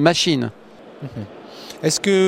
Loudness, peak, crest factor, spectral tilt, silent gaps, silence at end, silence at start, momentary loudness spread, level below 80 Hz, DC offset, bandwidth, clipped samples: -19 LUFS; -2 dBFS; 18 dB; -4 dB/octave; none; 0 s; 0 s; 19 LU; -60 dBFS; under 0.1%; 16 kHz; under 0.1%